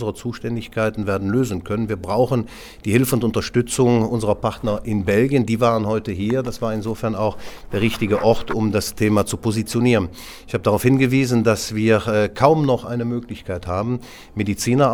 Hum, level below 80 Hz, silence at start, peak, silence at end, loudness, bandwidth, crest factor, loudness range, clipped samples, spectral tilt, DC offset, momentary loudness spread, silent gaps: none; -42 dBFS; 0 s; 0 dBFS; 0 s; -20 LUFS; 19.5 kHz; 20 dB; 3 LU; under 0.1%; -6 dB/octave; under 0.1%; 10 LU; none